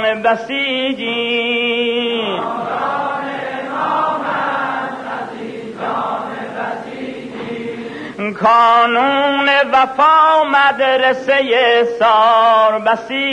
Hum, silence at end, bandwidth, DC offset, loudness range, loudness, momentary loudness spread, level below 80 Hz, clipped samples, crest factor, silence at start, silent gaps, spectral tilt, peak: none; 0 s; 10 kHz; under 0.1%; 11 LU; -14 LUFS; 15 LU; -58 dBFS; under 0.1%; 12 dB; 0 s; none; -4.5 dB/octave; -2 dBFS